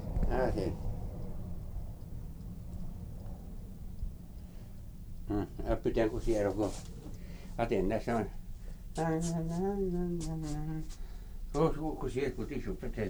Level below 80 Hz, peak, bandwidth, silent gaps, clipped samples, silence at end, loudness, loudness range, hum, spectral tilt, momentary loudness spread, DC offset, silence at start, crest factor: -40 dBFS; -16 dBFS; over 20 kHz; none; under 0.1%; 0 s; -36 LUFS; 11 LU; none; -7 dB/octave; 17 LU; under 0.1%; 0 s; 20 dB